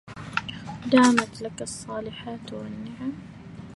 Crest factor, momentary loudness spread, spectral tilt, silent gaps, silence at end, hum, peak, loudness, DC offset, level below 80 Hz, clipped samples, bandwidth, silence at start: 22 dB; 18 LU; -4.5 dB/octave; none; 0 s; none; -4 dBFS; -26 LUFS; under 0.1%; -56 dBFS; under 0.1%; 11.5 kHz; 0.05 s